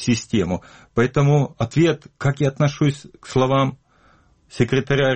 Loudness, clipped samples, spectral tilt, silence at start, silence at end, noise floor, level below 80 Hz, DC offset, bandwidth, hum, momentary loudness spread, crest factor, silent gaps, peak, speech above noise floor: -20 LUFS; under 0.1%; -6.5 dB/octave; 0 s; 0 s; -56 dBFS; -48 dBFS; under 0.1%; 8.8 kHz; none; 7 LU; 16 dB; none; -4 dBFS; 36 dB